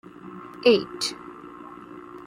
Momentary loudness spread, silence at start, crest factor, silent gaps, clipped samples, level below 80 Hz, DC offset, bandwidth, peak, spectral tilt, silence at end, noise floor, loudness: 22 LU; 0.25 s; 20 dB; none; under 0.1%; -66 dBFS; under 0.1%; 14.5 kHz; -6 dBFS; -3.5 dB/octave; 0.05 s; -42 dBFS; -23 LUFS